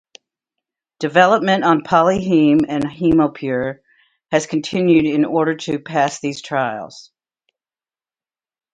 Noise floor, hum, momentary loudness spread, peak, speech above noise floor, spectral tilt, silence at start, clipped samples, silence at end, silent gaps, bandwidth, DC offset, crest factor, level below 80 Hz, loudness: under -90 dBFS; none; 10 LU; 0 dBFS; over 74 dB; -6 dB/octave; 1 s; under 0.1%; 1.7 s; none; 9.2 kHz; under 0.1%; 18 dB; -52 dBFS; -17 LUFS